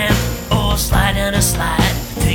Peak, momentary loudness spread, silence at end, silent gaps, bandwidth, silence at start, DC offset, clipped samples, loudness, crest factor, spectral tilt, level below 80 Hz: -2 dBFS; 3 LU; 0 s; none; over 20 kHz; 0 s; under 0.1%; under 0.1%; -16 LUFS; 14 dB; -4 dB/octave; -22 dBFS